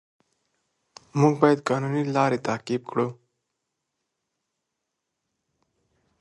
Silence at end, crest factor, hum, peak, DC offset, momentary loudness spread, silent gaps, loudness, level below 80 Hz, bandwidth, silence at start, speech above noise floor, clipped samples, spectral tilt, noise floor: 3.05 s; 24 dB; none; -2 dBFS; under 0.1%; 9 LU; none; -24 LUFS; -72 dBFS; 11.5 kHz; 1.15 s; 59 dB; under 0.1%; -7 dB/octave; -82 dBFS